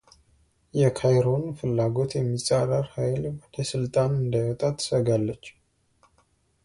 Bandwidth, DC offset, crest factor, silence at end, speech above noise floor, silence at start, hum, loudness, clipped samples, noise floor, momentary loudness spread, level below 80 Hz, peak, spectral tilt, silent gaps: 11.5 kHz; under 0.1%; 16 dB; 1.15 s; 42 dB; 0.75 s; none; -25 LUFS; under 0.1%; -66 dBFS; 9 LU; -54 dBFS; -10 dBFS; -6.5 dB/octave; none